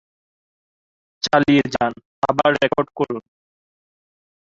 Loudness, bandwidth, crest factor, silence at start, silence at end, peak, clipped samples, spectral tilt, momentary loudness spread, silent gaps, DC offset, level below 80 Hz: -19 LUFS; 7.6 kHz; 20 dB; 1.25 s; 1.3 s; -2 dBFS; under 0.1%; -5 dB/octave; 10 LU; 2.05-2.22 s; under 0.1%; -54 dBFS